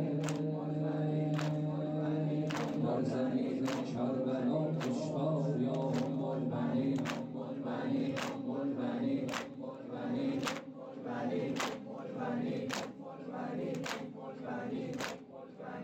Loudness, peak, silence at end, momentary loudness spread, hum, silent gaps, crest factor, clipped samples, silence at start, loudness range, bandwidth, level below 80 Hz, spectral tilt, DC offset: -36 LUFS; -24 dBFS; 0 s; 10 LU; none; none; 12 dB; under 0.1%; 0 s; 5 LU; 16 kHz; -76 dBFS; -6.5 dB/octave; under 0.1%